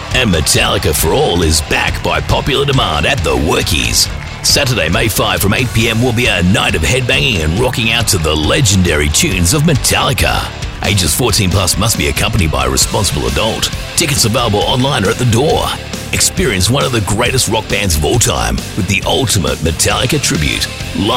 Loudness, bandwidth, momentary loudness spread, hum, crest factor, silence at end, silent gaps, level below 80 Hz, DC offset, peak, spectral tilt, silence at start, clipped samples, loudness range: -12 LUFS; 16.5 kHz; 4 LU; none; 12 dB; 0 s; none; -24 dBFS; under 0.1%; 0 dBFS; -3.5 dB/octave; 0 s; under 0.1%; 2 LU